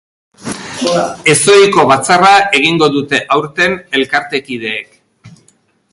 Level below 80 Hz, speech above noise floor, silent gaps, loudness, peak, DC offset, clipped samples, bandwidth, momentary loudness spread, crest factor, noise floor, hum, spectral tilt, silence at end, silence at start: -52 dBFS; 43 dB; none; -10 LUFS; 0 dBFS; under 0.1%; under 0.1%; 11.5 kHz; 14 LU; 12 dB; -53 dBFS; none; -3 dB/octave; 0.65 s; 0.4 s